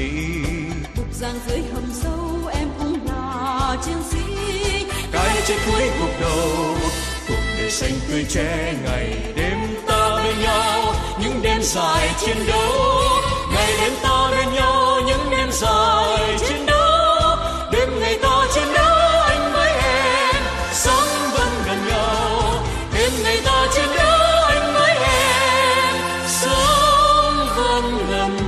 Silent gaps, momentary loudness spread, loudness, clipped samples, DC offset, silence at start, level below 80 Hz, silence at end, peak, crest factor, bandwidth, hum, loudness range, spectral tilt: none; 10 LU; -18 LUFS; under 0.1%; under 0.1%; 0 s; -28 dBFS; 0 s; -4 dBFS; 16 dB; 13.5 kHz; none; 7 LU; -3.5 dB/octave